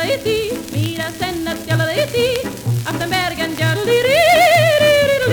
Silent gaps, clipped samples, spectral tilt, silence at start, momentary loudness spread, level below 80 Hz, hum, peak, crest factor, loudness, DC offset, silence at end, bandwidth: none; under 0.1%; -4.5 dB/octave; 0 s; 11 LU; -44 dBFS; none; 0 dBFS; 16 dB; -16 LUFS; under 0.1%; 0 s; over 20 kHz